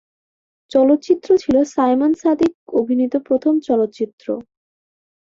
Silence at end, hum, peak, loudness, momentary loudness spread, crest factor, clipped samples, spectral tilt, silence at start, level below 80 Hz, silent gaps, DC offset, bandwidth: 0.95 s; none; -4 dBFS; -17 LUFS; 10 LU; 14 dB; under 0.1%; -6 dB/octave; 0.75 s; -56 dBFS; 2.55-2.67 s, 4.13-4.18 s; under 0.1%; 7.6 kHz